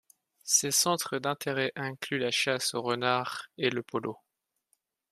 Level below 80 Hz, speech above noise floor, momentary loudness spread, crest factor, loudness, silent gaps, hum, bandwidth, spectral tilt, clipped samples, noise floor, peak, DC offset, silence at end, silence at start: -78 dBFS; 53 dB; 11 LU; 22 dB; -29 LUFS; none; none; 15.5 kHz; -2 dB/octave; under 0.1%; -83 dBFS; -10 dBFS; under 0.1%; 0.95 s; 0.45 s